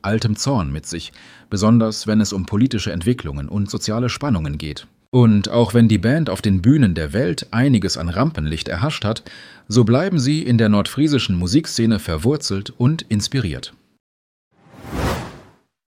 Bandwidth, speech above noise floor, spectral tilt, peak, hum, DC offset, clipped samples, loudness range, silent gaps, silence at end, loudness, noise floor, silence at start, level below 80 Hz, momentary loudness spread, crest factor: 15 kHz; 30 dB; -6 dB/octave; -2 dBFS; none; under 0.1%; under 0.1%; 5 LU; 5.08-5.12 s, 14.00-14.51 s; 0.5 s; -18 LUFS; -48 dBFS; 0.05 s; -38 dBFS; 12 LU; 16 dB